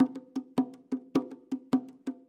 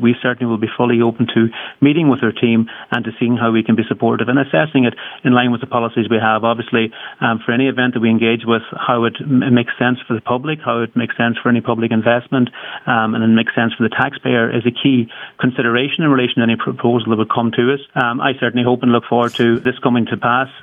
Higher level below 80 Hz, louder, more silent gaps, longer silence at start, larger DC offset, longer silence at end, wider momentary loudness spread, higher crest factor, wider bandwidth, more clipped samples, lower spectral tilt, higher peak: second, -76 dBFS vs -62 dBFS; second, -33 LUFS vs -16 LUFS; neither; about the same, 0 s vs 0 s; neither; first, 0.15 s vs 0 s; first, 9 LU vs 5 LU; about the same, 18 dB vs 14 dB; first, 9.4 kHz vs 3.8 kHz; neither; about the same, -7 dB/octave vs -8 dB/octave; second, -14 dBFS vs 0 dBFS